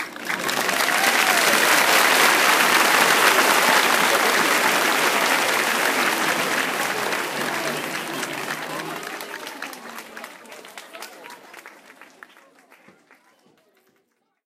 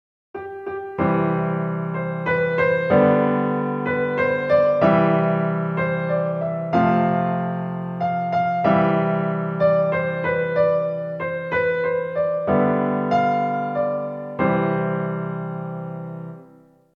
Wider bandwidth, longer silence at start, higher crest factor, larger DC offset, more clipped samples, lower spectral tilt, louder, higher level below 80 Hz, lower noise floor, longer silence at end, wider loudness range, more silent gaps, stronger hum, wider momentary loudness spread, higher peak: first, 16 kHz vs 5.8 kHz; second, 0 s vs 0.35 s; about the same, 20 dB vs 16 dB; neither; neither; second, -0.5 dB/octave vs -9.5 dB/octave; first, -18 LUFS vs -21 LUFS; second, -70 dBFS vs -60 dBFS; first, -69 dBFS vs -51 dBFS; first, 2.75 s vs 0.5 s; first, 20 LU vs 3 LU; neither; neither; first, 21 LU vs 12 LU; about the same, -2 dBFS vs -4 dBFS